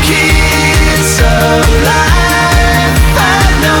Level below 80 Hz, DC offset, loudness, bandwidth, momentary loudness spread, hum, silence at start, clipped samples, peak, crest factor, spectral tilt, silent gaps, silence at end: -12 dBFS; under 0.1%; -8 LUFS; 19.5 kHz; 1 LU; none; 0 s; under 0.1%; 0 dBFS; 8 dB; -4 dB/octave; none; 0 s